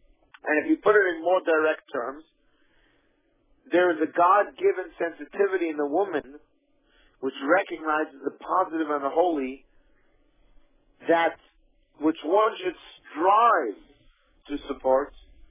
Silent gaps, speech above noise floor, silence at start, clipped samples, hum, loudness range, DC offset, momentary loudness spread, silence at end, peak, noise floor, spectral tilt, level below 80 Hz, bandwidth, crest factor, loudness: none; 43 dB; 0.45 s; under 0.1%; none; 4 LU; under 0.1%; 15 LU; 0.3 s; -8 dBFS; -67 dBFS; -8 dB/octave; -62 dBFS; 3.8 kHz; 18 dB; -25 LUFS